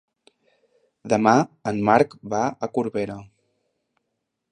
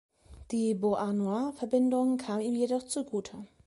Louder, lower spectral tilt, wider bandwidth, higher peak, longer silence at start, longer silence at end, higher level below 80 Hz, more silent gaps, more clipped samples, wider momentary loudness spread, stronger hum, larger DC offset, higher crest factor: first, -22 LUFS vs -30 LUFS; about the same, -6 dB/octave vs -6 dB/octave; second, 9.8 kHz vs 11.5 kHz; first, -2 dBFS vs -16 dBFS; first, 1.05 s vs 0.3 s; first, 1.3 s vs 0.2 s; about the same, -62 dBFS vs -62 dBFS; neither; neither; first, 13 LU vs 9 LU; neither; neither; first, 22 dB vs 14 dB